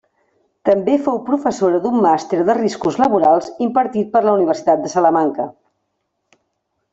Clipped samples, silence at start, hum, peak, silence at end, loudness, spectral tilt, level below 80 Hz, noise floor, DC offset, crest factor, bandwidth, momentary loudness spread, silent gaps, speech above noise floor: under 0.1%; 0.65 s; none; 0 dBFS; 1.4 s; -16 LUFS; -6 dB/octave; -60 dBFS; -72 dBFS; under 0.1%; 16 dB; 8 kHz; 5 LU; none; 56 dB